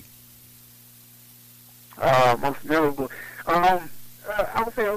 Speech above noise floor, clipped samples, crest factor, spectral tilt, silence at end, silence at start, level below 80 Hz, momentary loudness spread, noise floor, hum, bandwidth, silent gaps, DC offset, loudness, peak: 27 dB; under 0.1%; 14 dB; -5 dB/octave; 0 s; 1.9 s; -50 dBFS; 14 LU; -50 dBFS; 60 Hz at -55 dBFS; 15.5 kHz; none; under 0.1%; -23 LUFS; -10 dBFS